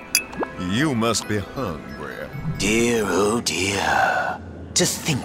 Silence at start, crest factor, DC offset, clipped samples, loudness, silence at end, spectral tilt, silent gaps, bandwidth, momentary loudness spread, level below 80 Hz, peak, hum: 0 s; 22 dB; under 0.1%; under 0.1%; -22 LUFS; 0 s; -3.5 dB/octave; none; 16 kHz; 12 LU; -44 dBFS; -2 dBFS; none